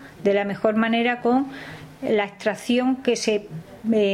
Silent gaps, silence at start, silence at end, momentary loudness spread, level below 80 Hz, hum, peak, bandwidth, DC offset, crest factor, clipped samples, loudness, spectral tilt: none; 0 s; 0 s; 11 LU; -60 dBFS; none; -4 dBFS; 14 kHz; under 0.1%; 18 dB; under 0.1%; -23 LUFS; -5 dB/octave